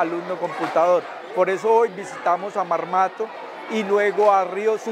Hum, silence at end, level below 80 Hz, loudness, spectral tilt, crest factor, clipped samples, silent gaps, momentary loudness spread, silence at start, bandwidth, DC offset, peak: none; 0 s; -84 dBFS; -21 LUFS; -5 dB/octave; 16 dB; under 0.1%; none; 10 LU; 0 s; 11.5 kHz; under 0.1%; -4 dBFS